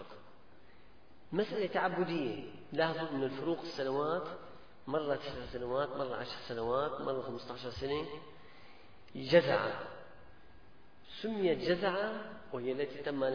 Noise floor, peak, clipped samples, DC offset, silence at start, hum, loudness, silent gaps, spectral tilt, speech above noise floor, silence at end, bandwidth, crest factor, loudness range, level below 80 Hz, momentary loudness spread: -62 dBFS; -12 dBFS; under 0.1%; 0.2%; 0 s; none; -36 LUFS; none; -4 dB/octave; 27 dB; 0 s; 5.4 kHz; 24 dB; 3 LU; -64 dBFS; 16 LU